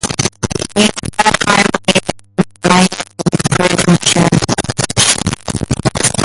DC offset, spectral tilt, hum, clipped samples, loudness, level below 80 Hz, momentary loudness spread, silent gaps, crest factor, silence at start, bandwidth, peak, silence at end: under 0.1%; -3.5 dB/octave; none; under 0.1%; -13 LUFS; -34 dBFS; 8 LU; none; 14 dB; 0.05 s; 11.5 kHz; 0 dBFS; 0 s